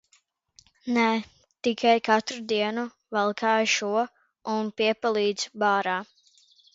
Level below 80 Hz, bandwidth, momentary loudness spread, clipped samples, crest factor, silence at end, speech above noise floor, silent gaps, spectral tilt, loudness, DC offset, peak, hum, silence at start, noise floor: -74 dBFS; 8 kHz; 9 LU; under 0.1%; 20 dB; 0.7 s; 41 dB; none; -3.5 dB/octave; -25 LUFS; under 0.1%; -6 dBFS; none; 0.85 s; -66 dBFS